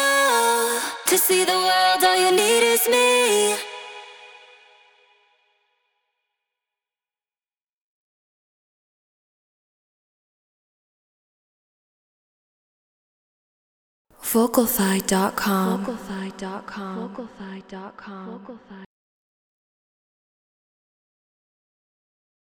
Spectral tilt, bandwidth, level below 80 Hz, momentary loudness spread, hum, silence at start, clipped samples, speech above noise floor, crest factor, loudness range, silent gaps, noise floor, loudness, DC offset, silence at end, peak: -2.5 dB/octave; over 20 kHz; -62 dBFS; 21 LU; none; 0 s; under 0.1%; over 69 dB; 22 dB; 21 LU; 7.73-14.05 s; under -90 dBFS; -19 LUFS; under 0.1%; 3.75 s; -4 dBFS